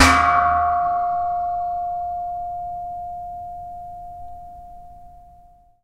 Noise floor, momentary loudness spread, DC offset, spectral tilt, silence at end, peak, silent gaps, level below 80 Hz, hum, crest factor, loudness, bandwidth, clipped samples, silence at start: -50 dBFS; 22 LU; under 0.1%; -3.5 dB/octave; 0.4 s; 0 dBFS; none; -40 dBFS; none; 22 dB; -22 LUFS; 15.5 kHz; under 0.1%; 0 s